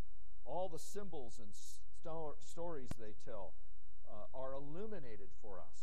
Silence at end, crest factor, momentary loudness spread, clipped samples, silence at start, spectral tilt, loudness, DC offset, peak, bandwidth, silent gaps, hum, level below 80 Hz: 0 s; 20 dB; 13 LU; under 0.1%; 0 s; -5.5 dB/octave; -51 LUFS; 3%; -26 dBFS; 13 kHz; none; none; -62 dBFS